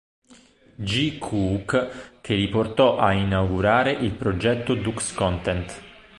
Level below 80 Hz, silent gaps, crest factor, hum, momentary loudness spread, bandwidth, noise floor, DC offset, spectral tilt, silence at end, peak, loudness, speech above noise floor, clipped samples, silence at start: -42 dBFS; none; 20 dB; none; 10 LU; 11.5 kHz; -53 dBFS; under 0.1%; -5.5 dB/octave; 0.25 s; -4 dBFS; -23 LUFS; 30 dB; under 0.1%; 0.8 s